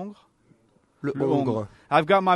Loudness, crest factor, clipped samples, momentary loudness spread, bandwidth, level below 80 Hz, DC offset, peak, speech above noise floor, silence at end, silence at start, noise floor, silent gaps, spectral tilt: -24 LUFS; 18 dB; under 0.1%; 13 LU; 11.5 kHz; -66 dBFS; under 0.1%; -6 dBFS; 40 dB; 0 s; 0 s; -63 dBFS; none; -7.5 dB/octave